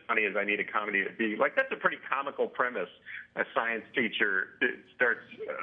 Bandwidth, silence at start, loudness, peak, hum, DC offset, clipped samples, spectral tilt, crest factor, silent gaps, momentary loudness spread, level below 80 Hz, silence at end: 5 kHz; 0.1 s; -30 LUFS; -10 dBFS; none; under 0.1%; under 0.1%; -7 dB/octave; 22 dB; none; 8 LU; -82 dBFS; 0 s